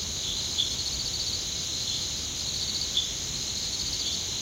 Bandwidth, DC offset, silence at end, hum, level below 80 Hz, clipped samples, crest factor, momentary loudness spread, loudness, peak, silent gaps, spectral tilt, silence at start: 16 kHz; under 0.1%; 0 s; none; -46 dBFS; under 0.1%; 18 dB; 3 LU; -28 LUFS; -12 dBFS; none; -0.5 dB/octave; 0 s